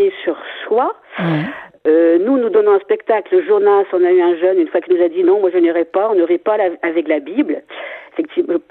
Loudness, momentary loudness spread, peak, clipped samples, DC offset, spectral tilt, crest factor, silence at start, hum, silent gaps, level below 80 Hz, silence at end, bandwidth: -15 LUFS; 10 LU; -2 dBFS; under 0.1%; under 0.1%; -10 dB/octave; 14 dB; 0 s; none; none; -66 dBFS; 0.1 s; 4.1 kHz